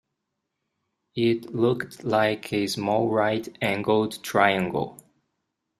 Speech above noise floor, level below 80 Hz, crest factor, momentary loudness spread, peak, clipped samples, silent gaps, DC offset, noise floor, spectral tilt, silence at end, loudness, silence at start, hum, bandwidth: 57 dB; -64 dBFS; 22 dB; 7 LU; -4 dBFS; under 0.1%; none; under 0.1%; -81 dBFS; -5.5 dB/octave; 0.85 s; -24 LUFS; 1.15 s; none; 15 kHz